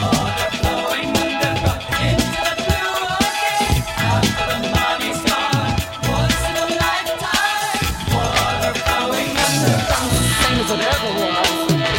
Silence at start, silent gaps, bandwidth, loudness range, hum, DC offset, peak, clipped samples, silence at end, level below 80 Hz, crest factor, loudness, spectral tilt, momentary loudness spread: 0 s; none; 16.5 kHz; 2 LU; none; under 0.1%; -2 dBFS; under 0.1%; 0 s; -32 dBFS; 16 dB; -18 LUFS; -4 dB/octave; 3 LU